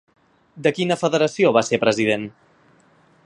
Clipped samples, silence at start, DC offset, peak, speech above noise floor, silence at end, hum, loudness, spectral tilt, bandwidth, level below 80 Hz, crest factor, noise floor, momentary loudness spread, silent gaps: under 0.1%; 0.55 s; under 0.1%; -2 dBFS; 37 dB; 0.95 s; none; -19 LUFS; -5 dB/octave; 11 kHz; -64 dBFS; 20 dB; -56 dBFS; 6 LU; none